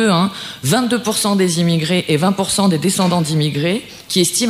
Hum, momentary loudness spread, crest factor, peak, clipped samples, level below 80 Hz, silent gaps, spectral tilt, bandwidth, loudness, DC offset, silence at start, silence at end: none; 5 LU; 14 dB; -2 dBFS; under 0.1%; -54 dBFS; none; -4.5 dB/octave; 16 kHz; -16 LUFS; under 0.1%; 0 s; 0 s